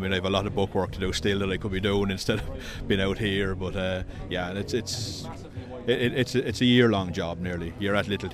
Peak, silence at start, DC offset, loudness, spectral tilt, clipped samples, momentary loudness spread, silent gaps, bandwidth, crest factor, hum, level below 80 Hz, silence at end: -6 dBFS; 0 s; under 0.1%; -27 LUFS; -5.5 dB/octave; under 0.1%; 10 LU; none; 15 kHz; 20 dB; none; -42 dBFS; 0 s